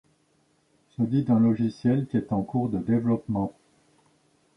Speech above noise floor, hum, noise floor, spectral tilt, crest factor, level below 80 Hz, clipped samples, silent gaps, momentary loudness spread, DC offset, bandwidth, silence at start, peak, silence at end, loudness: 43 dB; none; -67 dBFS; -10 dB/octave; 16 dB; -58 dBFS; under 0.1%; none; 8 LU; under 0.1%; 6 kHz; 1 s; -10 dBFS; 1.05 s; -26 LUFS